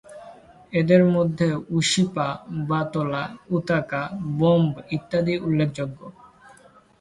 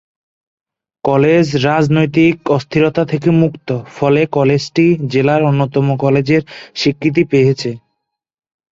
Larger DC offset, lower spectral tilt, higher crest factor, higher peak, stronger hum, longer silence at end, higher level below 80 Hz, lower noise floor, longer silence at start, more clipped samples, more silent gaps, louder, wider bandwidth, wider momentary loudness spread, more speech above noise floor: neither; about the same, -6 dB/octave vs -7 dB/octave; first, 20 dB vs 14 dB; second, -4 dBFS vs 0 dBFS; neither; about the same, 0.9 s vs 0.95 s; second, -56 dBFS vs -50 dBFS; second, -52 dBFS vs -74 dBFS; second, 0.1 s vs 1.05 s; neither; neither; second, -23 LUFS vs -14 LUFS; first, 11.5 kHz vs 7.8 kHz; first, 12 LU vs 6 LU; second, 30 dB vs 61 dB